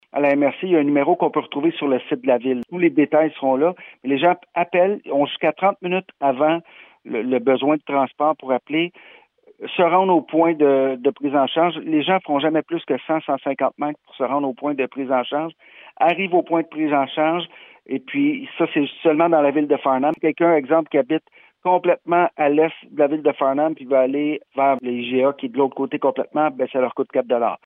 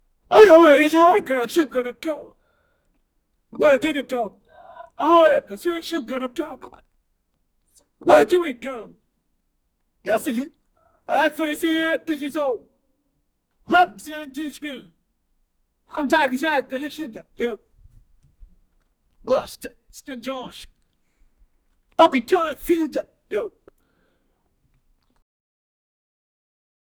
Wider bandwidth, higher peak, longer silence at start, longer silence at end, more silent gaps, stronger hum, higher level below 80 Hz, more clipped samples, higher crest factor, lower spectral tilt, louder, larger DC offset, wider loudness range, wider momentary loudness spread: second, 3.9 kHz vs over 20 kHz; about the same, -4 dBFS vs -2 dBFS; second, 0.15 s vs 0.3 s; second, 0.1 s vs 3.5 s; neither; neither; second, -78 dBFS vs -58 dBFS; neither; about the same, 16 dB vs 20 dB; first, -9 dB/octave vs -4 dB/octave; about the same, -20 LUFS vs -20 LUFS; neither; second, 3 LU vs 10 LU; second, 7 LU vs 20 LU